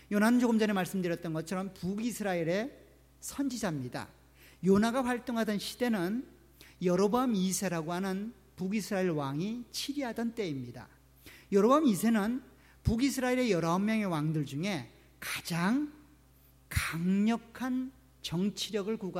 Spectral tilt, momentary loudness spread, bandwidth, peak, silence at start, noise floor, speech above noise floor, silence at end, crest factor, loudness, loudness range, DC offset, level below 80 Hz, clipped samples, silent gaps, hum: -5.5 dB/octave; 13 LU; 16 kHz; -14 dBFS; 0.1 s; -61 dBFS; 31 dB; 0 s; 18 dB; -32 LUFS; 5 LU; under 0.1%; -56 dBFS; under 0.1%; none; none